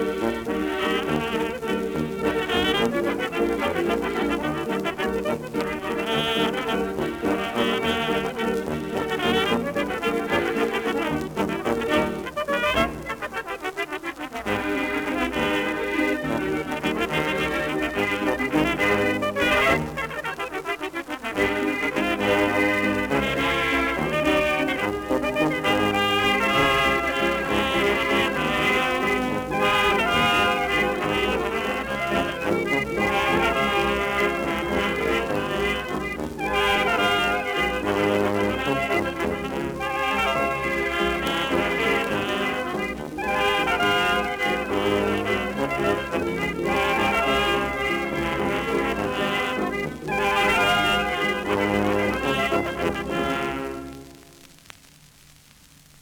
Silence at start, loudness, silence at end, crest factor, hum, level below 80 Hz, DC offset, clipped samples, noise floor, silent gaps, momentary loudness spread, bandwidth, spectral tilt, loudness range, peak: 0 s; -23 LUFS; 1.55 s; 16 dB; none; -44 dBFS; under 0.1%; under 0.1%; -52 dBFS; none; 7 LU; over 20 kHz; -4.5 dB/octave; 4 LU; -8 dBFS